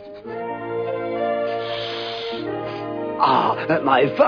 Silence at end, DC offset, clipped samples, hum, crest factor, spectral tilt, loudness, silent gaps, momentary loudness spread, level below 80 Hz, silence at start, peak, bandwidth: 0 s; under 0.1%; under 0.1%; none; 18 dB; -7 dB/octave; -23 LUFS; none; 11 LU; -62 dBFS; 0 s; -2 dBFS; 5.4 kHz